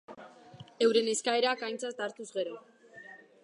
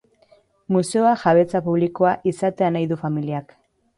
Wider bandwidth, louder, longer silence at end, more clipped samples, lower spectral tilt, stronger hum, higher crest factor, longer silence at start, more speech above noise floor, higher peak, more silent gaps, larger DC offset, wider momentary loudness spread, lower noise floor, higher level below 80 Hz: about the same, 11 kHz vs 11.5 kHz; second, -31 LUFS vs -20 LUFS; second, 0.25 s vs 0.55 s; neither; second, -2 dB/octave vs -7 dB/octave; neither; about the same, 20 dB vs 16 dB; second, 0.1 s vs 0.7 s; second, 22 dB vs 37 dB; second, -12 dBFS vs -4 dBFS; neither; neither; first, 24 LU vs 8 LU; second, -53 dBFS vs -57 dBFS; second, -84 dBFS vs -62 dBFS